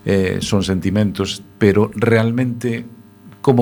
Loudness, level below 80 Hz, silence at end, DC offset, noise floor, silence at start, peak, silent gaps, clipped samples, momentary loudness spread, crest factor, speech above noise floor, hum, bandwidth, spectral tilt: -18 LUFS; -46 dBFS; 0 s; under 0.1%; -37 dBFS; 0.05 s; 0 dBFS; none; under 0.1%; 9 LU; 16 dB; 20 dB; none; 19 kHz; -6.5 dB/octave